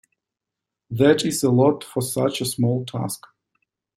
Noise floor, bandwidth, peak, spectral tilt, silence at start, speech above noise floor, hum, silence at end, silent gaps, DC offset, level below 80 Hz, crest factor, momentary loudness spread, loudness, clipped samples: -86 dBFS; 16 kHz; -4 dBFS; -5.5 dB/octave; 0.9 s; 65 dB; none; 0.8 s; none; under 0.1%; -60 dBFS; 18 dB; 12 LU; -21 LUFS; under 0.1%